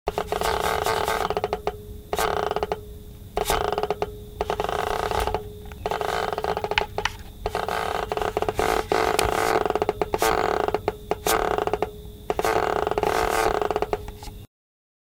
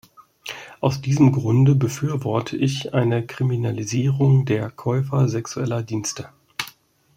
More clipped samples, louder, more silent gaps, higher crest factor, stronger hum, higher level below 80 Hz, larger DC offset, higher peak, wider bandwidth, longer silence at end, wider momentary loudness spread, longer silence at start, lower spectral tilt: neither; second, -25 LUFS vs -21 LUFS; neither; first, 24 dB vs 18 dB; neither; first, -40 dBFS vs -56 dBFS; neither; about the same, -2 dBFS vs -4 dBFS; first, 19 kHz vs 15.5 kHz; first, 0.6 s vs 0.45 s; second, 10 LU vs 15 LU; second, 0.05 s vs 0.2 s; second, -3.5 dB/octave vs -6.5 dB/octave